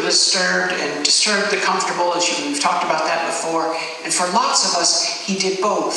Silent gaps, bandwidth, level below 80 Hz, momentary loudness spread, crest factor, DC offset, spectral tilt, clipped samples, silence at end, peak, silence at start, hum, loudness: none; 13 kHz; -76 dBFS; 6 LU; 18 dB; under 0.1%; -1 dB/octave; under 0.1%; 0 s; 0 dBFS; 0 s; none; -17 LUFS